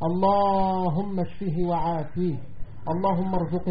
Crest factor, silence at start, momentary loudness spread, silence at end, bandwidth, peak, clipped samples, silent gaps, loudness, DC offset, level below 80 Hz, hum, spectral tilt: 14 dB; 0 s; 9 LU; 0 s; 5 kHz; -12 dBFS; under 0.1%; none; -25 LUFS; 2%; -42 dBFS; none; -8 dB/octave